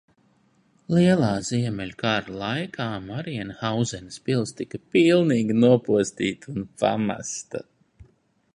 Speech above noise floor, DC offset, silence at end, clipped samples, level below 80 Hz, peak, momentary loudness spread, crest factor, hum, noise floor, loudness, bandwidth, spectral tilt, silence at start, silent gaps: 40 dB; under 0.1%; 0.5 s; under 0.1%; -56 dBFS; -4 dBFS; 14 LU; 20 dB; none; -63 dBFS; -24 LUFS; 11 kHz; -5.5 dB/octave; 0.9 s; none